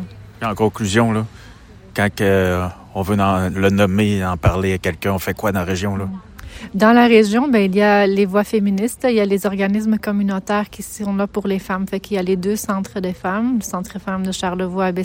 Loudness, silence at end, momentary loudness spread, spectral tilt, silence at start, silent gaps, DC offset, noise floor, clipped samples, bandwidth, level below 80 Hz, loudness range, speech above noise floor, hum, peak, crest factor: -18 LUFS; 0 s; 12 LU; -6 dB/octave; 0 s; none; under 0.1%; -41 dBFS; under 0.1%; 17 kHz; -42 dBFS; 6 LU; 24 dB; none; 0 dBFS; 16 dB